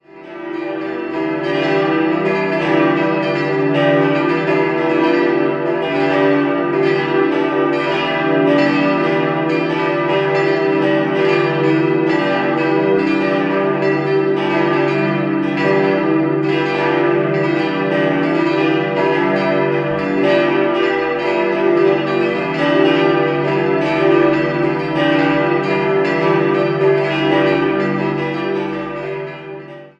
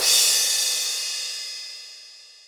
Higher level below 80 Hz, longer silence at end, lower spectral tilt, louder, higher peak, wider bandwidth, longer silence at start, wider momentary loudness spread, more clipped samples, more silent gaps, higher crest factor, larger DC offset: first, -56 dBFS vs -70 dBFS; about the same, 0.1 s vs 0.2 s; first, -7.5 dB/octave vs 4.5 dB/octave; first, -16 LUFS vs -20 LUFS; about the same, -2 dBFS vs -4 dBFS; second, 7.8 kHz vs over 20 kHz; first, 0.15 s vs 0 s; second, 5 LU vs 22 LU; neither; neither; second, 14 dB vs 20 dB; neither